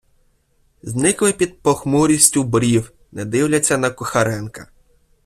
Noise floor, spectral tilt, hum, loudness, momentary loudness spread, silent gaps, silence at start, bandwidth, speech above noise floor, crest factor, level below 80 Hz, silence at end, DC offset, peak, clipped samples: -60 dBFS; -4 dB/octave; none; -17 LUFS; 16 LU; none; 0.85 s; 15.5 kHz; 43 dB; 18 dB; -48 dBFS; 0.6 s; under 0.1%; 0 dBFS; under 0.1%